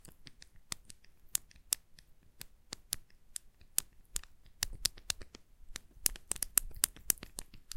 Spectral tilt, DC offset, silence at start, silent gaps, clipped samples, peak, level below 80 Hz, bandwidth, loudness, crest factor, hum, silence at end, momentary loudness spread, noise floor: 0.5 dB/octave; under 0.1%; 0.05 s; none; under 0.1%; -2 dBFS; -54 dBFS; 16.5 kHz; -37 LUFS; 40 dB; none; 0 s; 21 LU; -59 dBFS